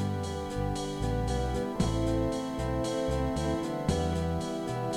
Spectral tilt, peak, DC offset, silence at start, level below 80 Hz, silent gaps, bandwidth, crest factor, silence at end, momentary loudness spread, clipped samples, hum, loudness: -6 dB/octave; -14 dBFS; under 0.1%; 0 s; -38 dBFS; none; 16.5 kHz; 16 dB; 0 s; 4 LU; under 0.1%; none; -31 LUFS